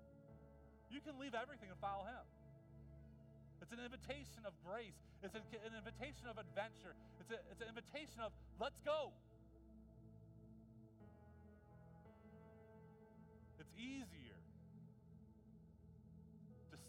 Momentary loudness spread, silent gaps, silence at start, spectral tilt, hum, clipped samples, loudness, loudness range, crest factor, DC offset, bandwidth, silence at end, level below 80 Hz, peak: 17 LU; none; 0 s; -5 dB/octave; none; under 0.1%; -53 LUFS; 14 LU; 24 dB; under 0.1%; 15.5 kHz; 0 s; -70 dBFS; -30 dBFS